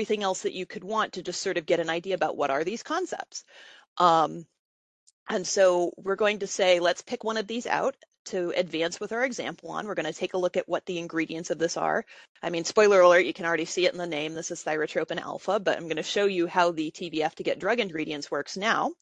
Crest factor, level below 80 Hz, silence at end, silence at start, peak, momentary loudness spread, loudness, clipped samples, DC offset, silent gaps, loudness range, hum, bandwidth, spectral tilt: 22 dB; -72 dBFS; 0.1 s; 0 s; -6 dBFS; 10 LU; -27 LUFS; under 0.1%; under 0.1%; 3.87-3.96 s, 4.59-5.07 s, 5.13-5.26 s, 8.19-8.25 s, 12.29-12.35 s; 6 LU; none; 9.8 kHz; -3.5 dB/octave